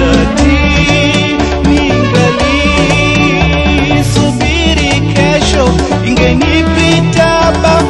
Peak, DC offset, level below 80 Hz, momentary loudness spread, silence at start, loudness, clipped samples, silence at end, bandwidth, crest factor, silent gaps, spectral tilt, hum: 0 dBFS; under 0.1%; -18 dBFS; 2 LU; 0 s; -9 LUFS; 0.1%; 0 s; 12 kHz; 8 dB; none; -5 dB/octave; none